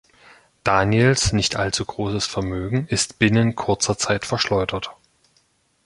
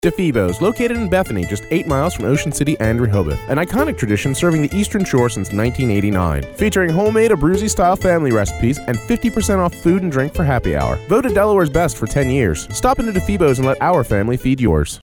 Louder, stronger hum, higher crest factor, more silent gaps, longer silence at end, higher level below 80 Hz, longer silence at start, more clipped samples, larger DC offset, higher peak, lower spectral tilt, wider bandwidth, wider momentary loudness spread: second, -21 LUFS vs -17 LUFS; neither; first, 20 dB vs 14 dB; neither; first, 0.9 s vs 0.05 s; second, -42 dBFS vs -30 dBFS; first, 0.65 s vs 0.05 s; neither; neither; about the same, -2 dBFS vs -2 dBFS; second, -4.5 dB/octave vs -6 dB/octave; second, 11.5 kHz vs over 20 kHz; first, 9 LU vs 5 LU